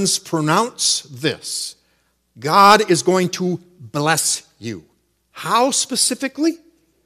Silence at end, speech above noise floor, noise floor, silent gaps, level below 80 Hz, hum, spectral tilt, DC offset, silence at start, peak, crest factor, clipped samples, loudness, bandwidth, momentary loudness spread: 0.5 s; 46 dB; -64 dBFS; none; -64 dBFS; none; -3 dB/octave; under 0.1%; 0 s; 0 dBFS; 20 dB; 0.1%; -17 LUFS; 15 kHz; 18 LU